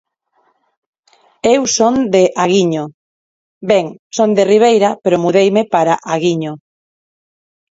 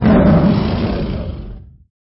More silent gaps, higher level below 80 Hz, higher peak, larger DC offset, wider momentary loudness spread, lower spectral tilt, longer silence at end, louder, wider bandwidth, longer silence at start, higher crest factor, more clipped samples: first, 2.94-3.61 s, 3.99-4.10 s vs none; second, -58 dBFS vs -26 dBFS; about the same, 0 dBFS vs -2 dBFS; neither; second, 12 LU vs 19 LU; second, -4.5 dB/octave vs -12.5 dB/octave; first, 1.15 s vs 0.45 s; about the same, -13 LUFS vs -15 LUFS; first, 8 kHz vs 5.8 kHz; first, 1.45 s vs 0 s; about the same, 14 dB vs 12 dB; neither